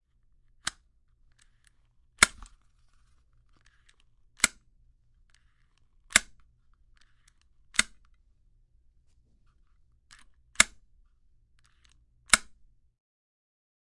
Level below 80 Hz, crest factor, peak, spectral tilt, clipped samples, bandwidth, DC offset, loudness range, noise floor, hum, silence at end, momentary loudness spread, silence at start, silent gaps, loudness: -56 dBFS; 34 dB; -2 dBFS; 0.5 dB/octave; under 0.1%; 11.5 kHz; under 0.1%; 7 LU; -65 dBFS; none; 1.6 s; 14 LU; 2.2 s; none; -26 LUFS